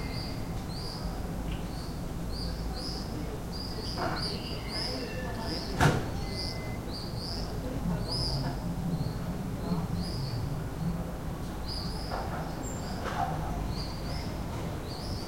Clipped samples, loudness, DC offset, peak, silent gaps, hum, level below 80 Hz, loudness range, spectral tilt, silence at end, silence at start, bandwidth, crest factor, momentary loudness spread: under 0.1%; -34 LUFS; under 0.1%; -10 dBFS; none; none; -40 dBFS; 4 LU; -5.5 dB/octave; 0 s; 0 s; 16.5 kHz; 22 dB; 5 LU